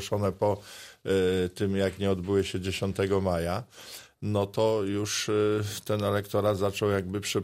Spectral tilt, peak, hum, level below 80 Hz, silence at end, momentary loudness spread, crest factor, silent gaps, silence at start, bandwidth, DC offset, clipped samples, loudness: -5.5 dB/octave; -12 dBFS; none; -56 dBFS; 0 s; 9 LU; 16 dB; none; 0 s; 16 kHz; under 0.1%; under 0.1%; -28 LUFS